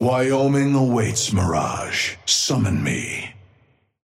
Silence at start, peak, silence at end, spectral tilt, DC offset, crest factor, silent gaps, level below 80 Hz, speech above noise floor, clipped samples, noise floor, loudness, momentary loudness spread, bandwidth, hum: 0 s; -6 dBFS; 0.75 s; -4.5 dB/octave; under 0.1%; 14 dB; none; -48 dBFS; 40 dB; under 0.1%; -59 dBFS; -20 LUFS; 7 LU; 16 kHz; none